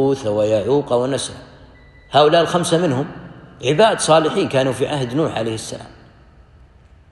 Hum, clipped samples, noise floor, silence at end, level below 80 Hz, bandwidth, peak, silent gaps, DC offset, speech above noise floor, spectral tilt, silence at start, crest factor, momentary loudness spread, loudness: none; under 0.1%; -47 dBFS; 1.25 s; -50 dBFS; 12.5 kHz; -2 dBFS; none; under 0.1%; 30 dB; -5 dB/octave; 0 s; 18 dB; 15 LU; -17 LUFS